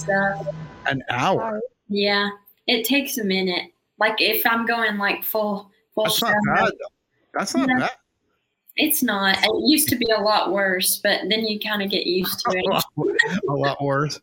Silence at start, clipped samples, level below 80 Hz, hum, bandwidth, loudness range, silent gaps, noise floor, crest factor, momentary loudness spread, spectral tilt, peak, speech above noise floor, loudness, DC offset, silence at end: 0 s; under 0.1%; -58 dBFS; none; 17 kHz; 3 LU; none; -72 dBFS; 20 dB; 10 LU; -3.5 dB/octave; -2 dBFS; 50 dB; -21 LUFS; under 0.1%; 0.05 s